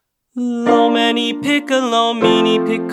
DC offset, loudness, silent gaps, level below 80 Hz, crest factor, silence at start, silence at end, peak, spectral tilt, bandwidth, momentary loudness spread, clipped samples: under 0.1%; -15 LUFS; none; -62 dBFS; 14 dB; 0.35 s; 0 s; -2 dBFS; -4.5 dB/octave; 13.5 kHz; 8 LU; under 0.1%